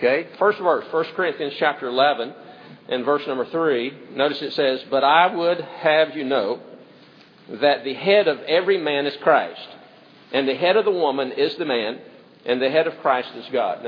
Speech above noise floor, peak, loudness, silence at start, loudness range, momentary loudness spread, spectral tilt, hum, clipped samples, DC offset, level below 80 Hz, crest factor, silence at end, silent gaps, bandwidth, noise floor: 28 dB; -2 dBFS; -21 LUFS; 0 s; 3 LU; 10 LU; -6.5 dB/octave; none; under 0.1%; under 0.1%; -84 dBFS; 20 dB; 0 s; none; 5.4 kHz; -49 dBFS